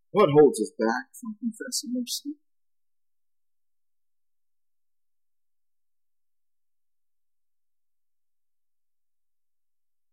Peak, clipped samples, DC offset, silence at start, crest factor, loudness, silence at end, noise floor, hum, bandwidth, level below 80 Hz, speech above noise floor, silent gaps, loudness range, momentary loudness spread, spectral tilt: -8 dBFS; under 0.1%; under 0.1%; 0.15 s; 24 dB; -25 LUFS; 7.8 s; under -90 dBFS; none; 15 kHz; -74 dBFS; over 66 dB; none; 15 LU; 16 LU; -4.5 dB/octave